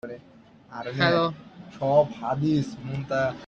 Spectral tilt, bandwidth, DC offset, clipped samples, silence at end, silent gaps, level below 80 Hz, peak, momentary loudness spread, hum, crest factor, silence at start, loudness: -7 dB/octave; 8 kHz; under 0.1%; under 0.1%; 0 s; none; -60 dBFS; -6 dBFS; 20 LU; none; 20 dB; 0.05 s; -25 LUFS